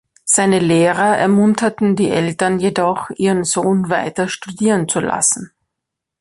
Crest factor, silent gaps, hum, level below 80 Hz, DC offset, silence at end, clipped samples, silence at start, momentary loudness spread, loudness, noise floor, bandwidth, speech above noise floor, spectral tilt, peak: 14 dB; none; none; -54 dBFS; under 0.1%; 0.75 s; under 0.1%; 0.25 s; 6 LU; -16 LUFS; -80 dBFS; 11.5 kHz; 65 dB; -4.5 dB/octave; -2 dBFS